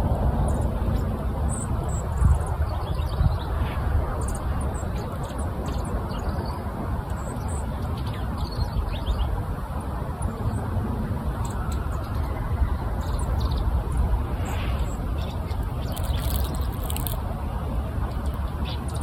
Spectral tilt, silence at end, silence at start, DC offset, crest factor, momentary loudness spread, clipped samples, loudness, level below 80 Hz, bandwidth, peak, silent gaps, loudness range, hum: -6.5 dB/octave; 0 s; 0 s; under 0.1%; 20 dB; 5 LU; under 0.1%; -28 LUFS; -28 dBFS; 18.5 kHz; -6 dBFS; none; 3 LU; none